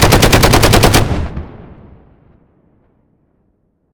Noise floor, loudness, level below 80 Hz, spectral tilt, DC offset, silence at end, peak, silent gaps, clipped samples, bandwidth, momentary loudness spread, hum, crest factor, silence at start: -60 dBFS; -9 LUFS; -22 dBFS; -4 dB/octave; under 0.1%; 2.3 s; 0 dBFS; none; 0.2%; over 20 kHz; 19 LU; none; 14 dB; 0 s